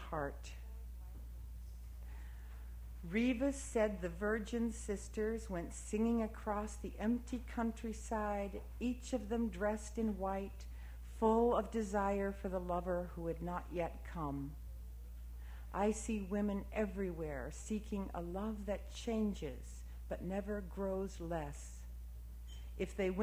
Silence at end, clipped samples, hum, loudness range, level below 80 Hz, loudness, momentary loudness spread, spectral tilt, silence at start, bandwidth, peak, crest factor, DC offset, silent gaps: 0 s; under 0.1%; none; 5 LU; -48 dBFS; -40 LUFS; 15 LU; -6 dB/octave; 0 s; 16 kHz; -20 dBFS; 20 dB; under 0.1%; none